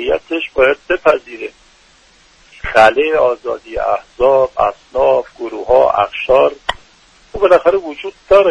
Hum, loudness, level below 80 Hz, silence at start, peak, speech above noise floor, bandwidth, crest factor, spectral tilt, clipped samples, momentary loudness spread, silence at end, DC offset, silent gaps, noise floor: none; -14 LUFS; -40 dBFS; 0 s; 0 dBFS; 35 dB; 10 kHz; 14 dB; -5 dB/octave; under 0.1%; 16 LU; 0 s; under 0.1%; none; -48 dBFS